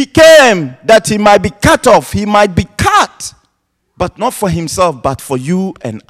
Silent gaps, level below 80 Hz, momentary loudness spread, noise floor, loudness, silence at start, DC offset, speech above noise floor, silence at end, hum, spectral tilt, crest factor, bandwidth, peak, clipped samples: none; -34 dBFS; 14 LU; -64 dBFS; -10 LUFS; 0 s; under 0.1%; 54 dB; 0.1 s; none; -4.5 dB/octave; 10 dB; 15.5 kHz; 0 dBFS; 2%